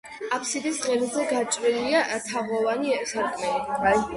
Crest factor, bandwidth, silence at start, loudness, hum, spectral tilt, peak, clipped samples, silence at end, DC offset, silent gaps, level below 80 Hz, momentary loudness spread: 16 dB; 11.5 kHz; 0.05 s; -25 LUFS; none; -2.5 dB/octave; -8 dBFS; under 0.1%; 0 s; under 0.1%; none; -56 dBFS; 5 LU